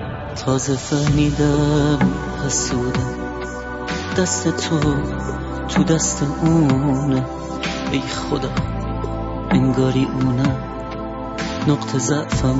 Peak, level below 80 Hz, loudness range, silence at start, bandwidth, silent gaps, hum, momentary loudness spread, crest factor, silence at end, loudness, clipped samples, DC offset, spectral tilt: -4 dBFS; -32 dBFS; 2 LU; 0 s; 8 kHz; none; none; 10 LU; 16 dB; 0 s; -20 LUFS; under 0.1%; under 0.1%; -5.5 dB/octave